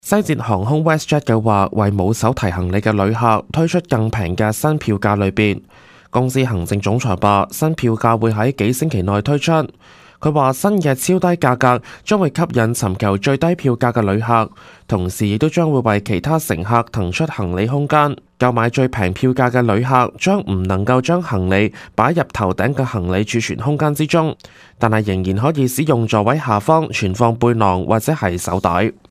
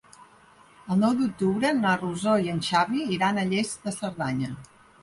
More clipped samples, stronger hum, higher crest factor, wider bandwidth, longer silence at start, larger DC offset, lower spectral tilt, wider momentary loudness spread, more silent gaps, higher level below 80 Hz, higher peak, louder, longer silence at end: neither; neither; about the same, 16 dB vs 16 dB; first, 16 kHz vs 11.5 kHz; second, 0.05 s vs 0.2 s; neither; about the same, -6.5 dB/octave vs -5.5 dB/octave; second, 4 LU vs 8 LU; neither; first, -44 dBFS vs -60 dBFS; first, 0 dBFS vs -10 dBFS; first, -17 LUFS vs -25 LUFS; second, 0.2 s vs 0.35 s